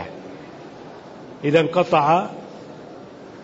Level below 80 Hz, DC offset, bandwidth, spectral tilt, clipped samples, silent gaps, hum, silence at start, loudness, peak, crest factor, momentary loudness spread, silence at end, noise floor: -64 dBFS; under 0.1%; 8 kHz; -6.5 dB/octave; under 0.1%; none; none; 0 s; -19 LUFS; -4 dBFS; 20 dB; 22 LU; 0 s; -40 dBFS